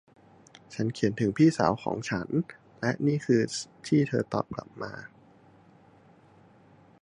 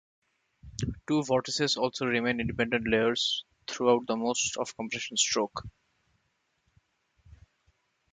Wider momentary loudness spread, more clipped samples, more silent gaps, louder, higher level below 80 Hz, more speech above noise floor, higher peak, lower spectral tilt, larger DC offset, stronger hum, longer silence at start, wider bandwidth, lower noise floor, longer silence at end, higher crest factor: first, 16 LU vs 10 LU; neither; neither; about the same, -28 LUFS vs -29 LUFS; second, -62 dBFS vs -56 dBFS; second, 30 dB vs 47 dB; first, -6 dBFS vs -10 dBFS; first, -6.5 dB/octave vs -3 dB/octave; neither; neither; about the same, 0.7 s vs 0.65 s; about the same, 10.5 kHz vs 9.6 kHz; second, -57 dBFS vs -76 dBFS; second, 1.95 s vs 2.45 s; about the same, 22 dB vs 22 dB